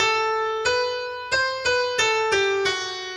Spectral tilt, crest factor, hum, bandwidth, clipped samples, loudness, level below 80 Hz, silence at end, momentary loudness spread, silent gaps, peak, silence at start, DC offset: -1 dB/octave; 16 dB; none; 13 kHz; under 0.1%; -22 LUFS; -56 dBFS; 0 s; 5 LU; none; -8 dBFS; 0 s; under 0.1%